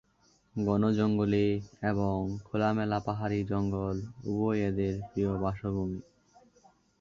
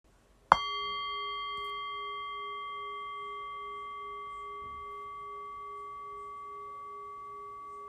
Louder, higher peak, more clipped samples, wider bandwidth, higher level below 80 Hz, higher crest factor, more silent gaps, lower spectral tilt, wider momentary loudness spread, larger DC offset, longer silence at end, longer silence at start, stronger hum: first, -31 LUFS vs -37 LUFS; second, -14 dBFS vs 0 dBFS; neither; second, 7.2 kHz vs 12.5 kHz; first, -52 dBFS vs -64 dBFS; second, 16 dB vs 36 dB; neither; first, -8.5 dB/octave vs -2.5 dB/octave; second, 8 LU vs 12 LU; neither; first, 1 s vs 0 s; about the same, 0.55 s vs 0.5 s; neither